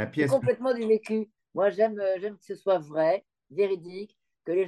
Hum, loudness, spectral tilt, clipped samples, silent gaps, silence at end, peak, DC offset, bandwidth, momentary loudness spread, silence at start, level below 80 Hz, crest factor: none; -27 LUFS; -7 dB/octave; under 0.1%; none; 0 s; -10 dBFS; under 0.1%; 12 kHz; 13 LU; 0 s; -74 dBFS; 16 dB